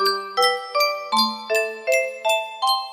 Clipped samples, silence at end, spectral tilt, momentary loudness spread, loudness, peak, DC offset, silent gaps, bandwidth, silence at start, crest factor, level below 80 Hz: under 0.1%; 0 s; -0.5 dB/octave; 2 LU; -21 LUFS; -6 dBFS; under 0.1%; none; 16 kHz; 0 s; 16 dB; -74 dBFS